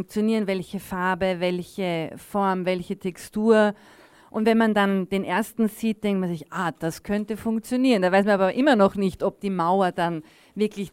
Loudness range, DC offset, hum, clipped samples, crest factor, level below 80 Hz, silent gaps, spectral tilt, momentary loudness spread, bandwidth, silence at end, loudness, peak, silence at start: 4 LU; under 0.1%; none; under 0.1%; 18 dB; -56 dBFS; none; -6 dB/octave; 10 LU; 16 kHz; 0.05 s; -24 LUFS; -6 dBFS; 0 s